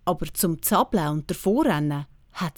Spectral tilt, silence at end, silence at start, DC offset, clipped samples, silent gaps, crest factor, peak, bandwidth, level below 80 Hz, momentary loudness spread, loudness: -5 dB/octave; 0.05 s; 0.05 s; under 0.1%; under 0.1%; none; 16 dB; -8 dBFS; over 20 kHz; -46 dBFS; 10 LU; -24 LUFS